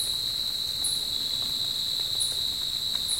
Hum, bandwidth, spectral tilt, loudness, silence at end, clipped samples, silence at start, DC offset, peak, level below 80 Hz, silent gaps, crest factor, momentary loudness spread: none; 16.5 kHz; 0 dB/octave; -26 LUFS; 0 s; under 0.1%; 0 s; 0.2%; -14 dBFS; -54 dBFS; none; 16 dB; 2 LU